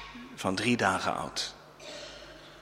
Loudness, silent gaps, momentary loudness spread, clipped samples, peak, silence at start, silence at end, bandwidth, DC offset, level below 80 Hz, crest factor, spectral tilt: -30 LUFS; none; 20 LU; under 0.1%; -10 dBFS; 0 s; 0 s; 16 kHz; under 0.1%; -60 dBFS; 24 dB; -3.5 dB/octave